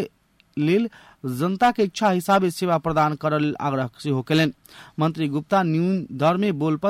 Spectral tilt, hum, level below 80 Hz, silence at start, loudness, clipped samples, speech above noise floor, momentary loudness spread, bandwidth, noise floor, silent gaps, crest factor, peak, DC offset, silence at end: -6.5 dB/octave; none; -58 dBFS; 0 s; -22 LUFS; under 0.1%; 38 dB; 7 LU; 16 kHz; -59 dBFS; none; 14 dB; -8 dBFS; under 0.1%; 0 s